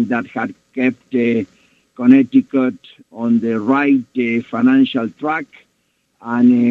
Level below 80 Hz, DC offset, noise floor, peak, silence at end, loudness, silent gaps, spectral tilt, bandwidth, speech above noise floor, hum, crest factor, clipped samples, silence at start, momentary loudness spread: -64 dBFS; under 0.1%; -65 dBFS; 0 dBFS; 0 s; -16 LUFS; none; -8 dB/octave; 4.2 kHz; 50 dB; none; 16 dB; under 0.1%; 0 s; 12 LU